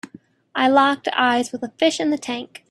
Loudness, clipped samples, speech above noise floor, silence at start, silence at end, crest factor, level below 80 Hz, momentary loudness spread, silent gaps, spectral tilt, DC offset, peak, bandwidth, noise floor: -20 LUFS; under 0.1%; 28 dB; 0.05 s; 0.25 s; 18 dB; -70 dBFS; 13 LU; none; -3 dB/octave; under 0.1%; -2 dBFS; 12.5 kHz; -47 dBFS